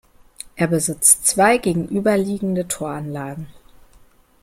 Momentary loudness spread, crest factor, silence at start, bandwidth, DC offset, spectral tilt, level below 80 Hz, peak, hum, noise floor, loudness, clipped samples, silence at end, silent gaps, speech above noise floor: 18 LU; 20 dB; 0.55 s; 16.5 kHz; under 0.1%; -4 dB/octave; -50 dBFS; 0 dBFS; none; -51 dBFS; -18 LUFS; under 0.1%; 0.9 s; none; 33 dB